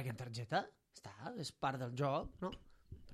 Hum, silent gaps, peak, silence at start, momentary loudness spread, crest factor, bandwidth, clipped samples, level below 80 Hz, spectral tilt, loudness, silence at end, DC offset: none; none; -24 dBFS; 0 s; 18 LU; 20 dB; 14.5 kHz; under 0.1%; -64 dBFS; -5.5 dB/octave; -42 LUFS; 0 s; under 0.1%